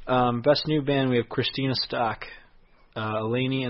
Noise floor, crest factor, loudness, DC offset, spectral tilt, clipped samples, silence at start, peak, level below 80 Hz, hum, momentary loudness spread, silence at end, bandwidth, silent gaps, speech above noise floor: -55 dBFS; 18 dB; -25 LUFS; under 0.1%; -9 dB/octave; under 0.1%; 0 s; -8 dBFS; -56 dBFS; none; 12 LU; 0 s; 6 kHz; none; 30 dB